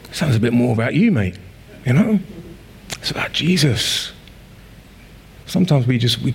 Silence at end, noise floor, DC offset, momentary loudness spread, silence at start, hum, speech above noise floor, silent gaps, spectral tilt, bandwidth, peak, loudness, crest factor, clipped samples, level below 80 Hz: 0 s; -42 dBFS; under 0.1%; 13 LU; 0.05 s; none; 25 dB; none; -5.5 dB/octave; 16.5 kHz; -4 dBFS; -18 LUFS; 14 dB; under 0.1%; -46 dBFS